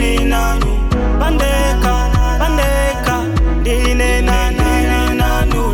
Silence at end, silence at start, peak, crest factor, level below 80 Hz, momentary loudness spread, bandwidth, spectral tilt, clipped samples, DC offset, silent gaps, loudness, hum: 0 s; 0 s; -2 dBFS; 12 dB; -14 dBFS; 2 LU; 17 kHz; -5.5 dB/octave; under 0.1%; under 0.1%; none; -15 LUFS; none